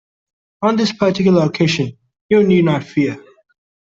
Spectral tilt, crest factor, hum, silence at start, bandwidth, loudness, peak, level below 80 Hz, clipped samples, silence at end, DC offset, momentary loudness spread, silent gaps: -6.5 dB/octave; 14 dB; none; 0.6 s; 7.6 kHz; -16 LUFS; -2 dBFS; -54 dBFS; under 0.1%; 0.75 s; under 0.1%; 8 LU; 2.21-2.29 s